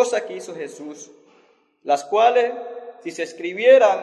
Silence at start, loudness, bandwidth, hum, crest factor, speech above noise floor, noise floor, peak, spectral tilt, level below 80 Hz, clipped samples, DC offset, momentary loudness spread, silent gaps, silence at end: 0 s; -19 LUFS; 11 kHz; none; 18 dB; 39 dB; -58 dBFS; -2 dBFS; -2.5 dB/octave; -84 dBFS; under 0.1%; under 0.1%; 22 LU; none; 0 s